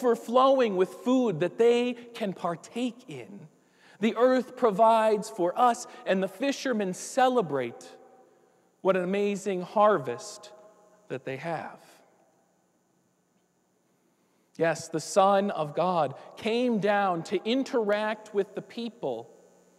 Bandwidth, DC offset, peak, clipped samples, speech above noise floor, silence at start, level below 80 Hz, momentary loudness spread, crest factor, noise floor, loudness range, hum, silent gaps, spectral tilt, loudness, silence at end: 14 kHz; under 0.1%; -10 dBFS; under 0.1%; 44 dB; 0 s; -84 dBFS; 14 LU; 18 dB; -70 dBFS; 12 LU; none; none; -5 dB/octave; -27 LUFS; 0.55 s